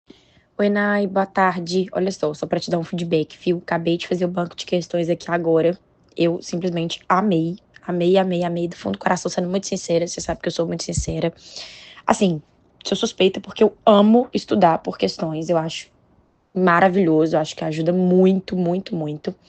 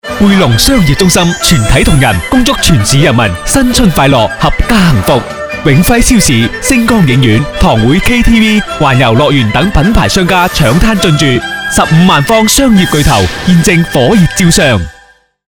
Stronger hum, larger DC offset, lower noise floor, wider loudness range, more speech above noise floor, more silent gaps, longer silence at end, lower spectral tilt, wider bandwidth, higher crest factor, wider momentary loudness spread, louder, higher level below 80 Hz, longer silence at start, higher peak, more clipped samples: neither; second, under 0.1% vs 2%; first, -59 dBFS vs -42 dBFS; first, 5 LU vs 1 LU; about the same, 39 dB vs 36 dB; neither; second, 0.15 s vs 0.45 s; about the same, -5.5 dB/octave vs -4.5 dB/octave; second, 8.8 kHz vs over 20 kHz; first, 20 dB vs 8 dB; first, 11 LU vs 4 LU; second, -20 LUFS vs -7 LUFS; second, -48 dBFS vs -18 dBFS; first, 0.6 s vs 0.05 s; about the same, 0 dBFS vs 0 dBFS; second, under 0.1% vs 4%